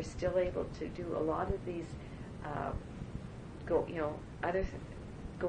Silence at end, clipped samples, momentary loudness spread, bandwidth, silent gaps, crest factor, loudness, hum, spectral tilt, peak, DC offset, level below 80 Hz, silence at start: 0 s; under 0.1%; 13 LU; 10 kHz; none; 18 dB; -38 LUFS; none; -7 dB/octave; -20 dBFS; under 0.1%; -50 dBFS; 0 s